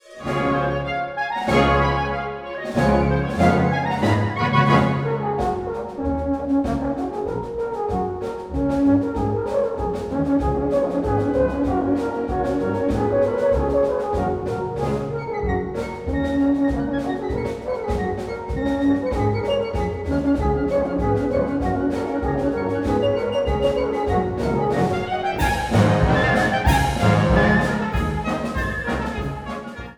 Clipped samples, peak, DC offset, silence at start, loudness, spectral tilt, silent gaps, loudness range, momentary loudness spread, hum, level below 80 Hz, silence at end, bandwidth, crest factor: under 0.1%; -2 dBFS; under 0.1%; 0.05 s; -21 LUFS; -7 dB/octave; none; 5 LU; 8 LU; none; -32 dBFS; 0.05 s; 17.5 kHz; 18 dB